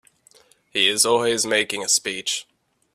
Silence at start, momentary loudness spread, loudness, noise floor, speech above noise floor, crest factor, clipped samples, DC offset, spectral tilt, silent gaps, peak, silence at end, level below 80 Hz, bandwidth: 0.75 s; 10 LU; -20 LUFS; -56 dBFS; 35 dB; 20 dB; under 0.1%; under 0.1%; -0.5 dB/octave; none; -4 dBFS; 0.55 s; -68 dBFS; 16 kHz